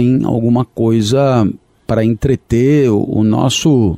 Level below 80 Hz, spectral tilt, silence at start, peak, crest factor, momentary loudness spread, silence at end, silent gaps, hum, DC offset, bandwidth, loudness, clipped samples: -36 dBFS; -6.5 dB/octave; 0 s; -2 dBFS; 10 dB; 4 LU; 0 s; none; none; under 0.1%; 14 kHz; -13 LUFS; under 0.1%